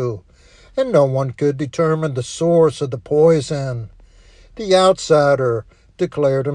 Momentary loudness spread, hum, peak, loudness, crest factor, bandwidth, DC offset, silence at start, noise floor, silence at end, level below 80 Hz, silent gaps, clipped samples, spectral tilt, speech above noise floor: 12 LU; none; -2 dBFS; -17 LUFS; 16 dB; 10.5 kHz; under 0.1%; 0 s; -47 dBFS; 0 s; -48 dBFS; none; under 0.1%; -6 dB/octave; 31 dB